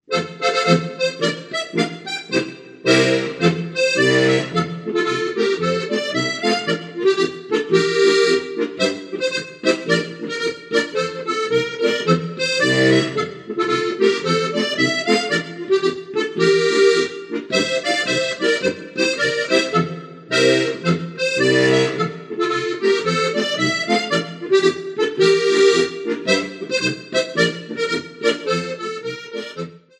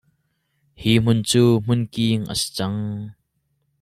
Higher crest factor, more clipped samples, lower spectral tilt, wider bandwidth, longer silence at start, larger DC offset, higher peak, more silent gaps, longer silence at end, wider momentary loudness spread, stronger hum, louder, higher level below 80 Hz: about the same, 18 dB vs 18 dB; neither; about the same, -4.5 dB/octave vs -5.5 dB/octave; second, 11.5 kHz vs 14 kHz; second, 0.1 s vs 0.8 s; neither; about the same, -2 dBFS vs -4 dBFS; neither; second, 0.2 s vs 0.7 s; second, 9 LU vs 12 LU; neither; about the same, -19 LUFS vs -20 LUFS; second, -64 dBFS vs -50 dBFS